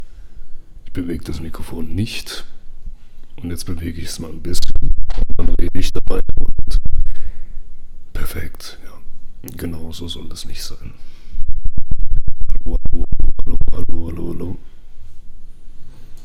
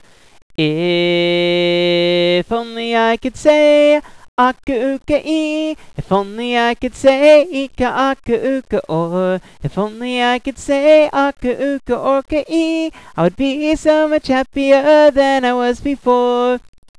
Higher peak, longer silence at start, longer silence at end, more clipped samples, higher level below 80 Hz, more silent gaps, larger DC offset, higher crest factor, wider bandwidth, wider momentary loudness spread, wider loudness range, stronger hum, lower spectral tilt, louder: about the same, 0 dBFS vs -2 dBFS; second, 0 s vs 0.6 s; second, 0 s vs 0.4 s; first, 2% vs under 0.1%; first, -20 dBFS vs -42 dBFS; second, none vs 4.28-4.37 s; second, under 0.1% vs 0.4%; about the same, 10 dB vs 14 dB; about the same, 10 kHz vs 11 kHz; first, 21 LU vs 10 LU; first, 7 LU vs 3 LU; neither; about the same, -5.5 dB/octave vs -5.5 dB/octave; second, -27 LUFS vs -15 LUFS